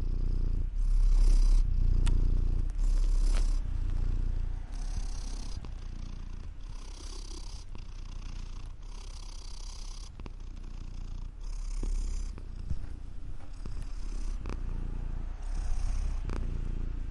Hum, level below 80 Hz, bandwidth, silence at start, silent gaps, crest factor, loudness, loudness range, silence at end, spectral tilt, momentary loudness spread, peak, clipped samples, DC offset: none; -30 dBFS; 10.5 kHz; 0 s; none; 14 dB; -37 LUFS; 14 LU; 0 s; -5.5 dB/octave; 15 LU; -16 dBFS; under 0.1%; under 0.1%